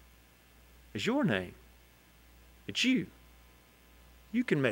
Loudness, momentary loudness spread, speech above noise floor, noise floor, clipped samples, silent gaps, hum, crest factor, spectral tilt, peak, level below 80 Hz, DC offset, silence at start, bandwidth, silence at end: -32 LUFS; 17 LU; 30 dB; -60 dBFS; under 0.1%; none; 60 Hz at -60 dBFS; 22 dB; -5 dB/octave; -14 dBFS; -62 dBFS; under 0.1%; 0.95 s; 16 kHz; 0 s